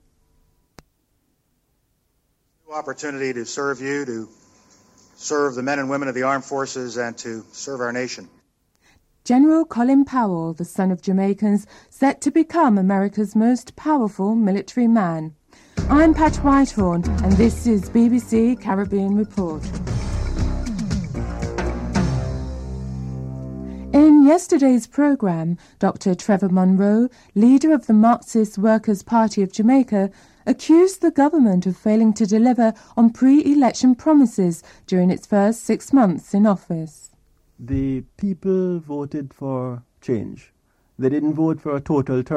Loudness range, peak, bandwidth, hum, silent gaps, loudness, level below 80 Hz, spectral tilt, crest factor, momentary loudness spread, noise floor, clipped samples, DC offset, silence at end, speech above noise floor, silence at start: 9 LU; -4 dBFS; 13 kHz; none; none; -19 LUFS; -36 dBFS; -7 dB/octave; 16 dB; 14 LU; -67 dBFS; under 0.1%; under 0.1%; 0 s; 50 dB; 2.7 s